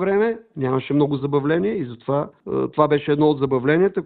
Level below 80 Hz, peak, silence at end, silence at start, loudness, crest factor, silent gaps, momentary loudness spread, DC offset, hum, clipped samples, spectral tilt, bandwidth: -56 dBFS; -2 dBFS; 0 s; 0 s; -21 LUFS; 18 dB; none; 7 LU; under 0.1%; none; under 0.1%; -12 dB/octave; 4.5 kHz